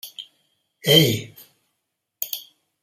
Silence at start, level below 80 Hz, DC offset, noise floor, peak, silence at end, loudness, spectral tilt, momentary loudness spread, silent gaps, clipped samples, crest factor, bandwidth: 0.05 s; -60 dBFS; under 0.1%; -78 dBFS; -2 dBFS; 0.45 s; -19 LUFS; -4 dB/octave; 23 LU; none; under 0.1%; 22 dB; 16 kHz